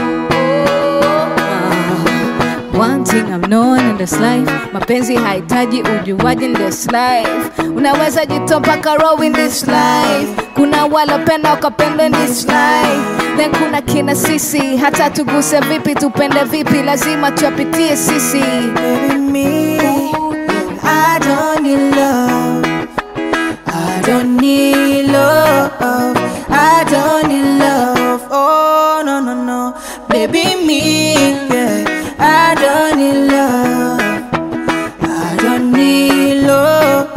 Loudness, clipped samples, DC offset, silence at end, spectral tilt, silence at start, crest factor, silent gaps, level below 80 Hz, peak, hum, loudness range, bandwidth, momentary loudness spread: -12 LUFS; under 0.1%; under 0.1%; 0 s; -4.5 dB/octave; 0 s; 12 dB; none; -42 dBFS; 0 dBFS; none; 2 LU; 16.5 kHz; 6 LU